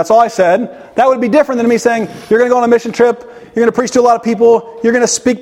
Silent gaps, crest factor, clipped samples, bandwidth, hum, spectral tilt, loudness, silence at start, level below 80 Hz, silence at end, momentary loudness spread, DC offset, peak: none; 12 dB; under 0.1%; 13 kHz; none; -4 dB/octave; -12 LUFS; 0 s; -52 dBFS; 0 s; 5 LU; under 0.1%; 0 dBFS